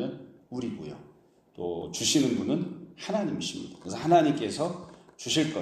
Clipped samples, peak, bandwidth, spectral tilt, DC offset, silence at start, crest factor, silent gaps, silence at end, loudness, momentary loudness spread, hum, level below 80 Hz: under 0.1%; -10 dBFS; 15 kHz; -4 dB/octave; under 0.1%; 0 s; 20 dB; none; 0 s; -28 LUFS; 18 LU; none; -66 dBFS